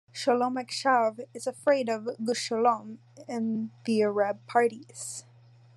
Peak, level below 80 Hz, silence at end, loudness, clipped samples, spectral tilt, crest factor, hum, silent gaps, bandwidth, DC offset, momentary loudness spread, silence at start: -10 dBFS; -88 dBFS; 0.55 s; -28 LUFS; under 0.1%; -4 dB/octave; 18 dB; none; none; 12.5 kHz; under 0.1%; 12 LU; 0.15 s